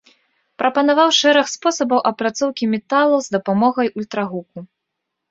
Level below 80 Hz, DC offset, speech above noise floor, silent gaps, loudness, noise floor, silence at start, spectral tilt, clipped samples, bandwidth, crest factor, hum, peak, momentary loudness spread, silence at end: -66 dBFS; under 0.1%; 61 dB; none; -17 LUFS; -78 dBFS; 0.6 s; -3.5 dB/octave; under 0.1%; 8 kHz; 16 dB; none; -2 dBFS; 11 LU; 0.65 s